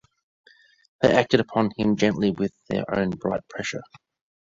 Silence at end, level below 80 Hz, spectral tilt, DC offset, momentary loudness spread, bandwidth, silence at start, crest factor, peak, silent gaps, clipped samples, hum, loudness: 0.7 s; -54 dBFS; -6 dB/octave; under 0.1%; 11 LU; 7.8 kHz; 1 s; 24 dB; -2 dBFS; none; under 0.1%; none; -24 LUFS